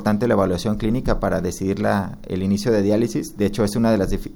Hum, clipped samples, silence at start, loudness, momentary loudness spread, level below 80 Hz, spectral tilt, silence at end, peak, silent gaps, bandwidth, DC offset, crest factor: none; under 0.1%; 0 s; -21 LUFS; 5 LU; -34 dBFS; -6.5 dB/octave; 0 s; -4 dBFS; none; 17.5 kHz; under 0.1%; 16 dB